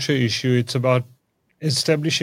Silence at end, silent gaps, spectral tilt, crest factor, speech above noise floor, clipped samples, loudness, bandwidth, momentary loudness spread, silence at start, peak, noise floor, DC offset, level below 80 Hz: 0 s; none; -5 dB/octave; 16 dB; 39 dB; under 0.1%; -21 LUFS; 16 kHz; 6 LU; 0 s; -4 dBFS; -59 dBFS; under 0.1%; -64 dBFS